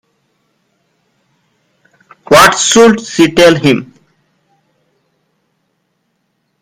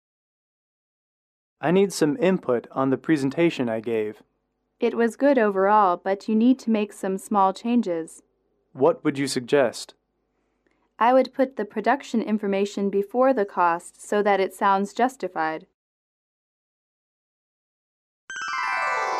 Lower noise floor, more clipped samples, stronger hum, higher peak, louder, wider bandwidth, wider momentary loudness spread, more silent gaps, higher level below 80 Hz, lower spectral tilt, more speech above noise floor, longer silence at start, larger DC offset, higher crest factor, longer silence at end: second, -64 dBFS vs -74 dBFS; first, 0.7% vs under 0.1%; neither; first, 0 dBFS vs -8 dBFS; first, -7 LUFS vs -23 LUFS; first, over 20 kHz vs 14.5 kHz; second, 6 LU vs 9 LU; second, none vs 15.74-18.28 s; first, -46 dBFS vs -74 dBFS; second, -3.5 dB/octave vs -5.5 dB/octave; first, 56 dB vs 52 dB; first, 2.3 s vs 1.6 s; neither; about the same, 14 dB vs 16 dB; first, 2.8 s vs 0 s